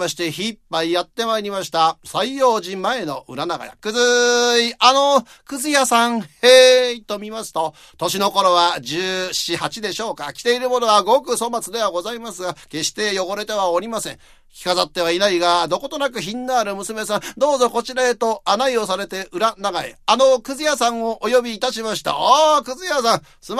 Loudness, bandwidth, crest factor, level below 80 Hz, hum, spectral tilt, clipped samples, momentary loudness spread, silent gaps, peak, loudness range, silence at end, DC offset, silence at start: -18 LUFS; 14 kHz; 18 dB; -56 dBFS; none; -2 dB/octave; under 0.1%; 12 LU; none; 0 dBFS; 6 LU; 0 s; under 0.1%; 0 s